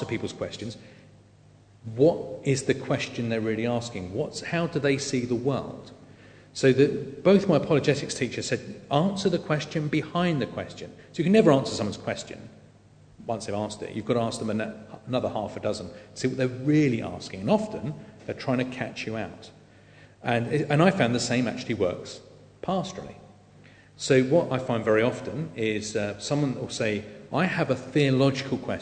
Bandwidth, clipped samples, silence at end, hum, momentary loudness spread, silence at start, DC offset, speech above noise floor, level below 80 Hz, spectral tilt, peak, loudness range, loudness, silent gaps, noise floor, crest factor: 9.4 kHz; under 0.1%; 0 s; 50 Hz at -50 dBFS; 16 LU; 0 s; under 0.1%; 29 dB; -60 dBFS; -6 dB/octave; -6 dBFS; 6 LU; -26 LUFS; none; -55 dBFS; 22 dB